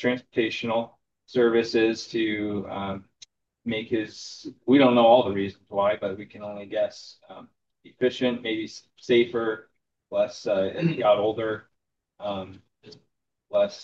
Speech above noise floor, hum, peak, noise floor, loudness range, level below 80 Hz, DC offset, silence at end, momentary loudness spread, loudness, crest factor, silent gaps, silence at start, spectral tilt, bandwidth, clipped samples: 55 dB; none; -6 dBFS; -80 dBFS; 6 LU; -70 dBFS; under 0.1%; 0 s; 17 LU; -25 LUFS; 20 dB; none; 0 s; -6 dB/octave; 7.8 kHz; under 0.1%